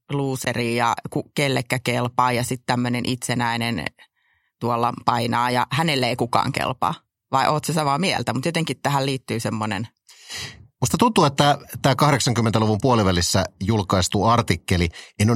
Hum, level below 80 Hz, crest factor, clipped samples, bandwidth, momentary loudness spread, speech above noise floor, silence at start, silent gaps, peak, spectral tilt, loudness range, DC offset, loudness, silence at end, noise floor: none; -48 dBFS; 20 dB; under 0.1%; 16.5 kHz; 8 LU; 46 dB; 0.1 s; none; 0 dBFS; -5 dB/octave; 4 LU; under 0.1%; -21 LUFS; 0 s; -67 dBFS